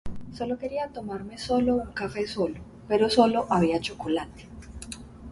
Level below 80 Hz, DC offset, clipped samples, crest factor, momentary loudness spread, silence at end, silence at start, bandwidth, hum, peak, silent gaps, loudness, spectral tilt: -48 dBFS; under 0.1%; under 0.1%; 20 dB; 20 LU; 0 s; 0.05 s; 11.5 kHz; none; -8 dBFS; none; -27 LUFS; -5.5 dB/octave